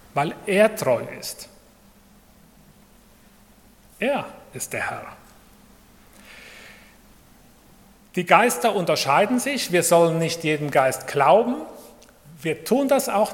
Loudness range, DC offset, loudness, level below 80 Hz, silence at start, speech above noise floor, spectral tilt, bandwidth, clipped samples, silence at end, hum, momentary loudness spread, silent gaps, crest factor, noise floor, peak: 15 LU; under 0.1%; -21 LUFS; -60 dBFS; 0.15 s; 32 dB; -4 dB/octave; 17.5 kHz; under 0.1%; 0 s; none; 21 LU; none; 24 dB; -53 dBFS; 0 dBFS